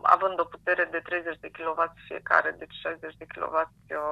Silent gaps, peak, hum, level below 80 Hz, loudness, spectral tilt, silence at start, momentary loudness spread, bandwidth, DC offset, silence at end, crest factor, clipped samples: none; -4 dBFS; none; -64 dBFS; -28 LUFS; -5 dB/octave; 0.05 s; 12 LU; 11.5 kHz; under 0.1%; 0 s; 24 dB; under 0.1%